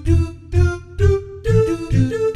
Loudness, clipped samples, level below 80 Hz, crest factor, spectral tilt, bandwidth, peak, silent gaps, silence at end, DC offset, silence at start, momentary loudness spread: -19 LUFS; under 0.1%; -26 dBFS; 14 dB; -8 dB/octave; 10.5 kHz; -2 dBFS; none; 0 s; under 0.1%; 0 s; 3 LU